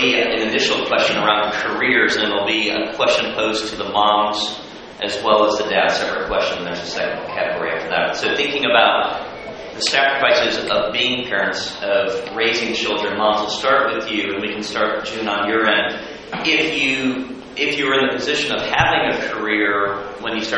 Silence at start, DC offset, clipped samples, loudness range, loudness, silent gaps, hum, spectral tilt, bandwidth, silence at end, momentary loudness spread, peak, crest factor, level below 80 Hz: 0 s; under 0.1%; under 0.1%; 2 LU; -18 LUFS; none; none; -3 dB/octave; 8.8 kHz; 0 s; 8 LU; 0 dBFS; 18 dB; -50 dBFS